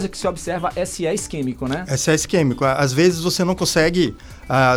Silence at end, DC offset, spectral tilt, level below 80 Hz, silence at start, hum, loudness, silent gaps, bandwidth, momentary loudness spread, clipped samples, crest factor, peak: 0 s; under 0.1%; -4.5 dB/octave; -40 dBFS; 0 s; none; -19 LUFS; none; 17 kHz; 8 LU; under 0.1%; 14 dB; -4 dBFS